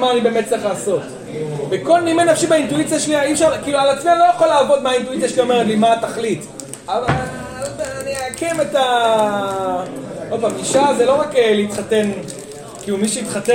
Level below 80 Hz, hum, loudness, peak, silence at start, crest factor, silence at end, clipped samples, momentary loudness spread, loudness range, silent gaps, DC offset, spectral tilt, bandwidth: -50 dBFS; none; -17 LUFS; -2 dBFS; 0 s; 16 dB; 0 s; under 0.1%; 13 LU; 5 LU; none; under 0.1%; -4 dB/octave; 16.5 kHz